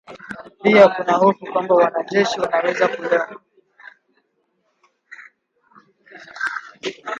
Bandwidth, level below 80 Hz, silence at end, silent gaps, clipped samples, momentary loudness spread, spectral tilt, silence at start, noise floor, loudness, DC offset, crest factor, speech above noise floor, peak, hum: 8.4 kHz; -68 dBFS; 0 s; none; under 0.1%; 18 LU; -5 dB/octave; 0.1 s; -68 dBFS; -18 LUFS; under 0.1%; 20 dB; 51 dB; 0 dBFS; none